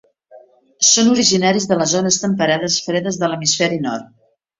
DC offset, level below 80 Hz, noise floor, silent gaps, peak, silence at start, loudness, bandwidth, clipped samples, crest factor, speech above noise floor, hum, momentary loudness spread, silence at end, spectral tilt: under 0.1%; -58 dBFS; -46 dBFS; none; 0 dBFS; 0.3 s; -15 LUFS; 7.8 kHz; under 0.1%; 16 dB; 30 dB; none; 9 LU; 0.55 s; -3 dB/octave